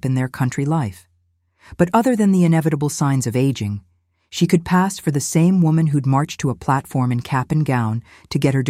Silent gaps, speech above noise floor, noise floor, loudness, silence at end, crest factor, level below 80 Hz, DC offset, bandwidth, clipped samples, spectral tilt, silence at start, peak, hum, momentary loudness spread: none; 46 dB; -64 dBFS; -19 LUFS; 0 s; 16 dB; -50 dBFS; under 0.1%; 15.5 kHz; under 0.1%; -6.5 dB/octave; 0.05 s; -2 dBFS; none; 8 LU